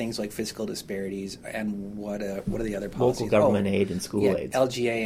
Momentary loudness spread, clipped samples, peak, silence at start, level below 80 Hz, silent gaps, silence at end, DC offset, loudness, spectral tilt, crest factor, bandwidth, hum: 11 LU; under 0.1%; -10 dBFS; 0 s; -48 dBFS; none; 0 s; under 0.1%; -27 LUFS; -5.5 dB/octave; 18 dB; 16 kHz; none